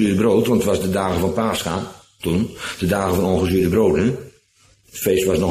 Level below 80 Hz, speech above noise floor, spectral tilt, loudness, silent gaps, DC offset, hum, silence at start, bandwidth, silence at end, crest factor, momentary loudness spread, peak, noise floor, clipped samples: -42 dBFS; 38 dB; -6 dB/octave; -19 LUFS; none; under 0.1%; none; 0 s; 15.5 kHz; 0 s; 14 dB; 10 LU; -4 dBFS; -56 dBFS; under 0.1%